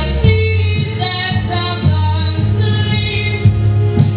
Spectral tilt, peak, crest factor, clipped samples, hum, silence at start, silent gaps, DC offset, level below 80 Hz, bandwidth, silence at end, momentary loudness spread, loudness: -10.5 dB/octave; 0 dBFS; 14 dB; under 0.1%; none; 0 s; none; under 0.1%; -24 dBFS; 4 kHz; 0 s; 4 LU; -15 LUFS